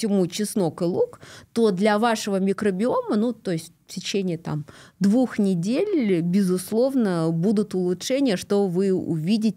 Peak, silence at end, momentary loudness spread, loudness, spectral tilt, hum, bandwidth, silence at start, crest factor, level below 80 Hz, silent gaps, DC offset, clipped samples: -8 dBFS; 0.05 s; 8 LU; -23 LUFS; -6 dB/octave; none; 15.5 kHz; 0 s; 14 dB; -66 dBFS; none; under 0.1%; under 0.1%